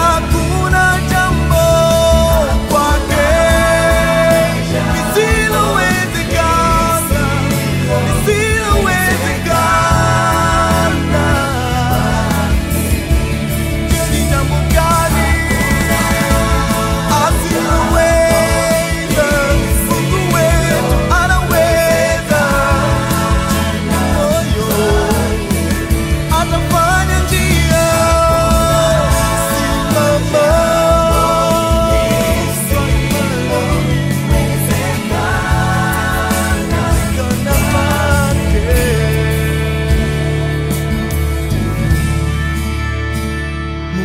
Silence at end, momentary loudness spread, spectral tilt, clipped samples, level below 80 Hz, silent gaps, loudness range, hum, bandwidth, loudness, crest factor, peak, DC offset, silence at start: 0 s; 5 LU; -5 dB/octave; under 0.1%; -20 dBFS; none; 3 LU; none; 16.5 kHz; -13 LUFS; 12 dB; 0 dBFS; under 0.1%; 0 s